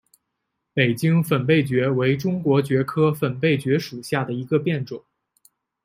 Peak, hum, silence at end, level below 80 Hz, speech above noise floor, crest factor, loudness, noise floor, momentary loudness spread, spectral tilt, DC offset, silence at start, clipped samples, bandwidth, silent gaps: -4 dBFS; none; 0.85 s; -62 dBFS; 58 dB; 18 dB; -21 LUFS; -78 dBFS; 7 LU; -7 dB/octave; under 0.1%; 0.75 s; under 0.1%; 16 kHz; none